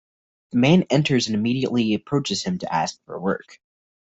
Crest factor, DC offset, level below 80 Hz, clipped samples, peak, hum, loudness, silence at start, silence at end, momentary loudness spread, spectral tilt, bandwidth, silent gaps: 18 dB; under 0.1%; -58 dBFS; under 0.1%; -4 dBFS; none; -22 LUFS; 0.55 s; 0.6 s; 9 LU; -5.5 dB/octave; 8 kHz; none